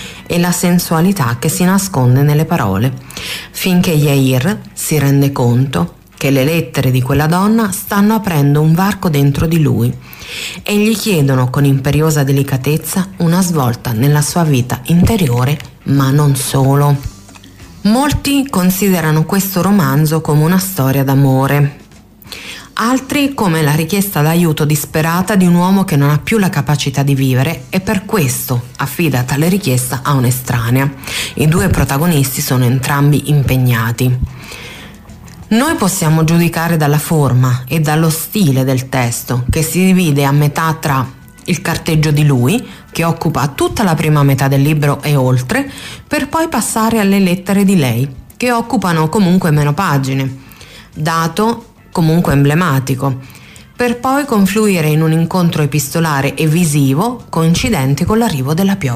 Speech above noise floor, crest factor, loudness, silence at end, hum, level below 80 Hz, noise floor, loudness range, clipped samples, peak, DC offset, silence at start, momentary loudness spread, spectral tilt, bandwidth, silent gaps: 26 dB; 10 dB; -13 LUFS; 0 s; none; -36 dBFS; -38 dBFS; 2 LU; under 0.1%; -2 dBFS; under 0.1%; 0 s; 7 LU; -6 dB/octave; 15.5 kHz; none